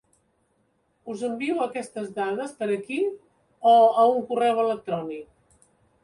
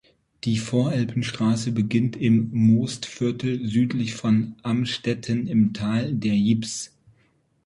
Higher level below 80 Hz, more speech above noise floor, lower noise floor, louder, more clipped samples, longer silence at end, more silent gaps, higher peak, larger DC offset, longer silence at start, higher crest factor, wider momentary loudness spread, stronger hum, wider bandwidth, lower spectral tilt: second, -72 dBFS vs -56 dBFS; first, 46 dB vs 42 dB; first, -69 dBFS vs -64 dBFS; about the same, -24 LUFS vs -23 LUFS; neither; about the same, 0.8 s vs 0.8 s; neither; about the same, -8 dBFS vs -8 dBFS; neither; first, 1.05 s vs 0.45 s; about the same, 18 dB vs 14 dB; first, 18 LU vs 7 LU; neither; about the same, 11.5 kHz vs 11.5 kHz; about the same, -5.5 dB/octave vs -6 dB/octave